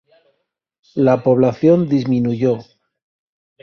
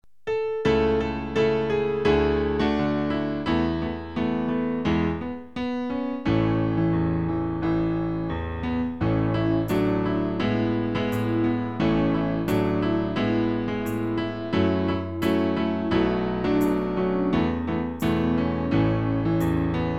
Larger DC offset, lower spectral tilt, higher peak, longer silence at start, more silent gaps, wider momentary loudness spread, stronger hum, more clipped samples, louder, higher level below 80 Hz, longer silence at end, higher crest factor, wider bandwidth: second, under 0.1% vs 0.5%; first, -9.5 dB/octave vs -8 dB/octave; first, -2 dBFS vs -8 dBFS; first, 0.95 s vs 0.25 s; neither; about the same, 7 LU vs 5 LU; neither; neither; first, -16 LUFS vs -25 LUFS; second, -58 dBFS vs -40 dBFS; first, 1 s vs 0 s; about the same, 16 dB vs 16 dB; second, 6.6 kHz vs 14 kHz